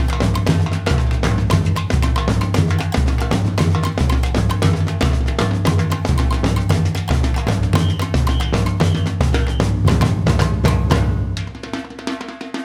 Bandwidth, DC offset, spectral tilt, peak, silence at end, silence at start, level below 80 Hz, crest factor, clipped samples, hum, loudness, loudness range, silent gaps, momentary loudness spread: 15 kHz; under 0.1%; -6.5 dB/octave; -2 dBFS; 0 s; 0 s; -22 dBFS; 16 dB; under 0.1%; none; -18 LUFS; 1 LU; none; 4 LU